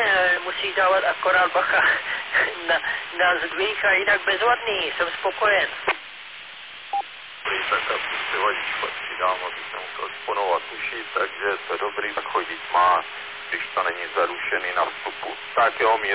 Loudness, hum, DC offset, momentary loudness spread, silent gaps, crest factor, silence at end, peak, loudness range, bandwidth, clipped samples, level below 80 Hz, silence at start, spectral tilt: -22 LUFS; none; 0.1%; 11 LU; none; 16 dB; 0 s; -8 dBFS; 6 LU; 4 kHz; under 0.1%; -60 dBFS; 0 s; -5.5 dB/octave